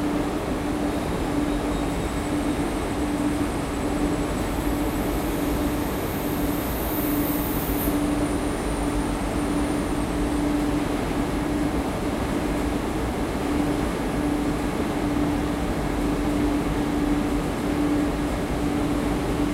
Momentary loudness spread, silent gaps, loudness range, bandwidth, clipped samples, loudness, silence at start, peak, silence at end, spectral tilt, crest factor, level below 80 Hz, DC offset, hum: 3 LU; none; 1 LU; 16 kHz; under 0.1%; -25 LUFS; 0 s; -10 dBFS; 0 s; -6 dB/octave; 14 dB; -32 dBFS; under 0.1%; none